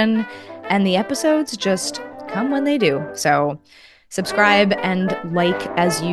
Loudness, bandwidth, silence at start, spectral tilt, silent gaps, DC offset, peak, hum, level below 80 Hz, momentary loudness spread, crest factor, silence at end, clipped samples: -19 LUFS; 12.5 kHz; 0 s; -4.5 dB/octave; none; under 0.1%; 0 dBFS; none; -60 dBFS; 12 LU; 20 dB; 0 s; under 0.1%